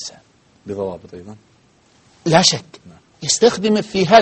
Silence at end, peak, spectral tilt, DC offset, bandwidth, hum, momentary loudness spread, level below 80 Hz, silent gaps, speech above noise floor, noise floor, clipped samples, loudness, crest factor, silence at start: 0 s; 0 dBFS; -3.5 dB/octave; under 0.1%; 8.8 kHz; none; 21 LU; -54 dBFS; none; 38 dB; -54 dBFS; under 0.1%; -17 LUFS; 18 dB; 0 s